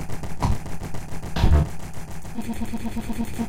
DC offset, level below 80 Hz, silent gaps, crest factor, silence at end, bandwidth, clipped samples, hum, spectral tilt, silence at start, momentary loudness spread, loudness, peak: 3%; -28 dBFS; none; 18 dB; 0 s; 16.5 kHz; under 0.1%; none; -6.5 dB/octave; 0 s; 14 LU; -27 LUFS; -6 dBFS